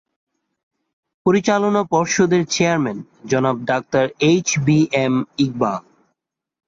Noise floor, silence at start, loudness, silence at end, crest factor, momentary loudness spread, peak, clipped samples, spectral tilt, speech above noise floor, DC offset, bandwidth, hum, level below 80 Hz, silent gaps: -77 dBFS; 1.25 s; -18 LUFS; 0.85 s; 16 dB; 6 LU; -4 dBFS; under 0.1%; -5 dB/octave; 59 dB; under 0.1%; 7.8 kHz; none; -56 dBFS; none